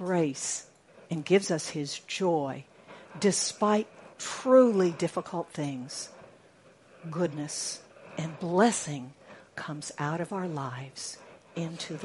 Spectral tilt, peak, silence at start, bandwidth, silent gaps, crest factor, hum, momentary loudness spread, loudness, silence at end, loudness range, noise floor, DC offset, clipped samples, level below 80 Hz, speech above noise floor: -4.5 dB/octave; -8 dBFS; 0 s; 11.5 kHz; none; 22 dB; none; 17 LU; -29 LUFS; 0 s; 8 LU; -58 dBFS; under 0.1%; under 0.1%; -76 dBFS; 29 dB